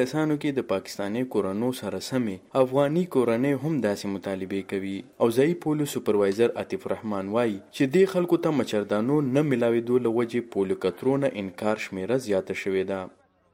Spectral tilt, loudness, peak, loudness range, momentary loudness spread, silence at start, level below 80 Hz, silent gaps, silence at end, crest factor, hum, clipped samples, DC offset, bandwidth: -6.5 dB/octave; -26 LUFS; -8 dBFS; 2 LU; 8 LU; 0 s; -68 dBFS; none; 0.45 s; 18 dB; none; under 0.1%; under 0.1%; 16 kHz